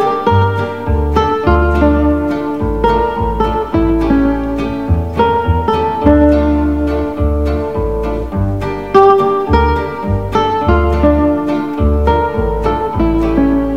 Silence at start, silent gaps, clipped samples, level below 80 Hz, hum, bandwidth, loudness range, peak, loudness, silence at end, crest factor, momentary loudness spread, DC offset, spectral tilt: 0 s; none; 0.1%; -20 dBFS; none; 7 kHz; 2 LU; 0 dBFS; -13 LUFS; 0 s; 12 dB; 7 LU; 1%; -8.5 dB/octave